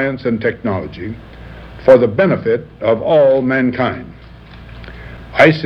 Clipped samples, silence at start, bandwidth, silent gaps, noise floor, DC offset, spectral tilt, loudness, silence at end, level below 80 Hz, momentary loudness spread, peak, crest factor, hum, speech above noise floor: 0.3%; 0 s; 7 kHz; none; -36 dBFS; under 0.1%; -8 dB/octave; -14 LUFS; 0 s; -40 dBFS; 24 LU; 0 dBFS; 16 dB; none; 23 dB